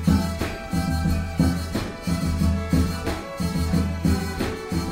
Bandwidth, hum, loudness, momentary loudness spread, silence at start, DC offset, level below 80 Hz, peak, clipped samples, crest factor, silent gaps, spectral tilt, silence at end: 16 kHz; none; -25 LUFS; 6 LU; 0 s; under 0.1%; -30 dBFS; -6 dBFS; under 0.1%; 16 dB; none; -6.5 dB/octave; 0 s